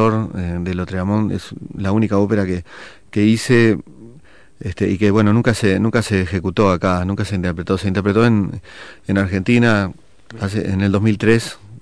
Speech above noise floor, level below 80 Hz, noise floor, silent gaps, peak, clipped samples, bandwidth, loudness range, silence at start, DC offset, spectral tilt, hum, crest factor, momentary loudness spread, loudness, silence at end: 30 dB; -44 dBFS; -47 dBFS; none; -2 dBFS; under 0.1%; 11 kHz; 2 LU; 0 s; under 0.1%; -7 dB/octave; none; 16 dB; 13 LU; -17 LUFS; 0.05 s